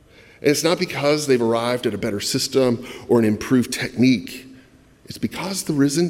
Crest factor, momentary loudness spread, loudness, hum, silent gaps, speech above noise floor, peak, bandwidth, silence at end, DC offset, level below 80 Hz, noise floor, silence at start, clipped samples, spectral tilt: 18 dB; 9 LU; -20 LUFS; none; none; 30 dB; -4 dBFS; 16.5 kHz; 0 s; under 0.1%; -54 dBFS; -50 dBFS; 0.45 s; under 0.1%; -4.5 dB/octave